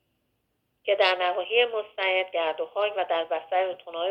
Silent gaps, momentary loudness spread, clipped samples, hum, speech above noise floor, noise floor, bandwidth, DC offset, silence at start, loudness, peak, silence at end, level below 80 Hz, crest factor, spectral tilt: none; 6 LU; under 0.1%; none; 49 dB; -75 dBFS; 8.6 kHz; under 0.1%; 0.85 s; -26 LUFS; -8 dBFS; 0 s; -80 dBFS; 18 dB; -3 dB/octave